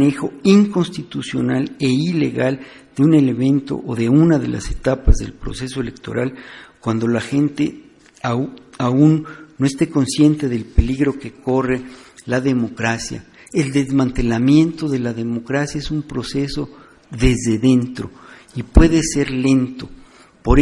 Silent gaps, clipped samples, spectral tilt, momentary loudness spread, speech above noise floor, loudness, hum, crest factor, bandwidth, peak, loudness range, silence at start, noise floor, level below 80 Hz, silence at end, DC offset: none; under 0.1%; -6.5 dB/octave; 14 LU; 23 dB; -18 LUFS; none; 18 dB; 11.5 kHz; 0 dBFS; 4 LU; 0 s; -40 dBFS; -28 dBFS; 0 s; under 0.1%